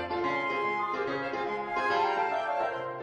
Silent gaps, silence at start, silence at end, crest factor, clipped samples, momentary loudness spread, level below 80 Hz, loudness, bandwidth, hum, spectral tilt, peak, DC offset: none; 0 s; 0 s; 14 dB; under 0.1%; 5 LU; -66 dBFS; -30 LUFS; 10 kHz; none; -5 dB/octave; -16 dBFS; under 0.1%